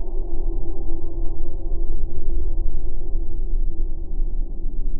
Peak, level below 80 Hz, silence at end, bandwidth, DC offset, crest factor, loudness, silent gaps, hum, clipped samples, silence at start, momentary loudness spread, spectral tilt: -6 dBFS; -20 dBFS; 0 s; 0.9 kHz; under 0.1%; 8 dB; -31 LUFS; none; none; under 0.1%; 0 s; 3 LU; -17.5 dB/octave